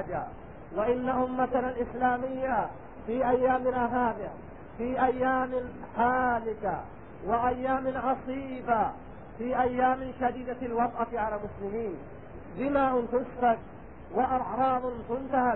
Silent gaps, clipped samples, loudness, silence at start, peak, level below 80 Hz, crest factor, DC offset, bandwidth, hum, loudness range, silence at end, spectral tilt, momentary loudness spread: none; under 0.1%; -29 LUFS; 0 s; -12 dBFS; -52 dBFS; 16 dB; 0.3%; 4.1 kHz; none; 2 LU; 0 s; -10.5 dB/octave; 14 LU